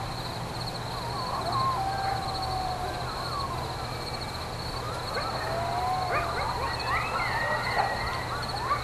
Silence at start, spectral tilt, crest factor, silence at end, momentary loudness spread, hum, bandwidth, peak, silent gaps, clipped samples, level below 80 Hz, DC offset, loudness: 0 s; -4 dB/octave; 18 dB; 0 s; 6 LU; none; 15 kHz; -12 dBFS; none; under 0.1%; -44 dBFS; under 0.1%; -30 LUFS